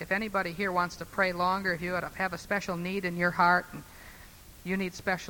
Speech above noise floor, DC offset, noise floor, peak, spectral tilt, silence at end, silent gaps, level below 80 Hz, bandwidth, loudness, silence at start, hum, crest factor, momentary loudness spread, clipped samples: 21 dB; under 0.1%; -51 dBFS; -10 dBFS; -5 dB/octave; 0 s; none; -56 dBFS; 20 kHz; -29 LUFS; 0 s; none; 20 dB; 20 LU; under 0.1%